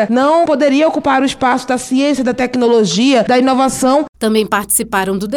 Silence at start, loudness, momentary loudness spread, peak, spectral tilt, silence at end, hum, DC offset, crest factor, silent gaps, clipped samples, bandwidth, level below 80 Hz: 0 s; -13 LUFS; 4 LU; 0 dBFS; -4 dB/octave; 0 s; none; under 0.1%; 12 dB; 4.09-4.13 s; under 0.1%; 17.5 kHz; -46 dBFS